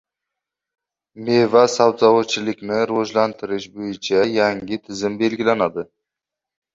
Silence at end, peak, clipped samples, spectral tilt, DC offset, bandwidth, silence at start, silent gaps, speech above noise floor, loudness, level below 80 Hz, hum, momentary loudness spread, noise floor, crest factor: 0.9 s; -2 dBFS; under 0.1%; -4.5 dB/octave; under 0.1%; 7.8 kHz; 1.15 s; none; 67 dB; -19 LUFS; -60 dBFS; none; 13 LU; -86 dBFS; 18 dB